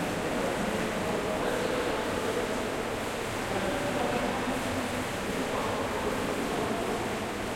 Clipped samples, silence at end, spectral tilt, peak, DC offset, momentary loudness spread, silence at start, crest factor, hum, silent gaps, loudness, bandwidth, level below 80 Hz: under 0.1%; 0 s; -4.5 dB/octave; -16 dBFS; under 0.1%; 3 LU; 0 s; 14 dB; none; none; -30 LUFS; 16.5 kHz; -48 dBFS